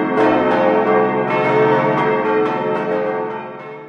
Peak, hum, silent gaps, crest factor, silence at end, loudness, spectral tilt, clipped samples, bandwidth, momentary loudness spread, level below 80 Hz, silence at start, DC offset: -2 dBFS; none; none; 14 dB; 0 s; -16 LUFS; -8 dB/octave; under 0.1%; 6.6 kHz; 8 LU; -56 dBFS; 0 s; under 0.1%